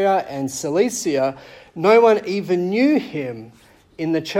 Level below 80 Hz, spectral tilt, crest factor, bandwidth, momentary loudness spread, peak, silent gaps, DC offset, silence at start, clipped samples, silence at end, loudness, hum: -62 dBFS; -5 dB/octave; 16 dB; 16 kHz; 16 LU; -4 dBFS; none; under 0.1%; 0 s; under 0.1%; 0 s; -19 LUFS; none